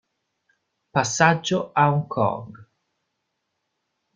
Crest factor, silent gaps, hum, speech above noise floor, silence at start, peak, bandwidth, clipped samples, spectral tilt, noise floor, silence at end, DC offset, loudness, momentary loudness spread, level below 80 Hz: 24 dB; none; none; 56 dB; 0.95 s; -2 dBFS; 9.4 kHz; under 0.1%; -4.5 dB/octave; -77 dBFS; 1.5 s; under 0.1%; -21 LUFS; 7 LU; -62 dBFS